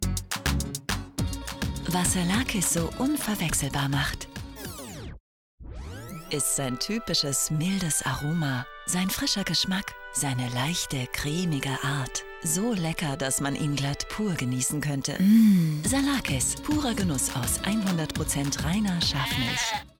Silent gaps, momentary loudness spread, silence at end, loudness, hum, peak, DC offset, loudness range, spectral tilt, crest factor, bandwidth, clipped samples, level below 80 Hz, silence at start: 5.20-5.58 s; 8 LU; 0.1 s; -26 LUFS; none; -10 dBFS; under 0.1%; 6 LU; -4 dB/octave; 16 dB; 19.5 kHz; under 0.1%; -42 dBFS; 0 s